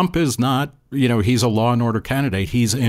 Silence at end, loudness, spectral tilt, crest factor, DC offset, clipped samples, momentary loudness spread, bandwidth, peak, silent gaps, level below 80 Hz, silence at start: 0 s; -19 LUFS; -5.5 dB/octave; 12 dB; under 0.1%; under 0.1%; 4 LU; 16 kHz; -6 dBFS; none; -42 dBFS; 0 s